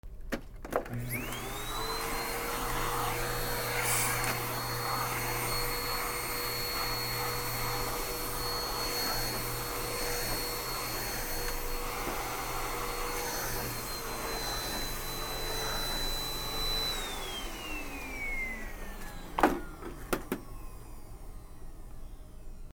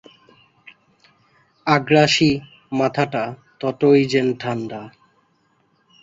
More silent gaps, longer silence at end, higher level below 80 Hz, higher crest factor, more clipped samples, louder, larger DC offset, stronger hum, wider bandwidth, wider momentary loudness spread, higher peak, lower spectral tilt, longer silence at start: neither; second, 0 s vs 1.15 s; first, -42 dBFS vs -56 dBFS; about the same, 24 dB vs 20 dB; neither; second, -33 LUFS vs -19 LUFS; neither; neither; first, over 20 kHz vs 8 kHz; about the same, 14 LU vs 13 LU; second, -10 dBFS vs -2 dBFS; second, -2.5 dB/octave vs -5.5 dB/octave; second, 0.05 s vs 1.65 s